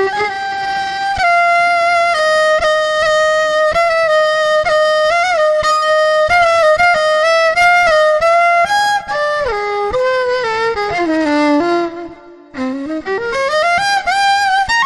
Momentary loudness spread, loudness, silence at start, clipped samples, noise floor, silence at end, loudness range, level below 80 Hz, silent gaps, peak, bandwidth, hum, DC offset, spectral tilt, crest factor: 8 LU; -13 LUFS; 0 s; under 0.1%; -35 dBFS; 0 s; 5 LU; -42 dBFS; none; -2 dBFS; 12 kHz; none; under 0.1%; -2.5 dB/octave; 12 dB